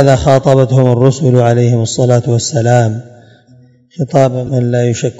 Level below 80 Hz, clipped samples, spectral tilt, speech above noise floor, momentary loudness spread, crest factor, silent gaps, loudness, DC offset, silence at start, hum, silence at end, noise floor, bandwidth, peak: -40 dBFS; 1%; -6.5 dB/octave; 34 dB; 6 LU; 10 dB; none; -11 LUFS; under 0.1%; 0 s; none; 0.05 s; -44 dBFS; 8 kHz; 0 dBFS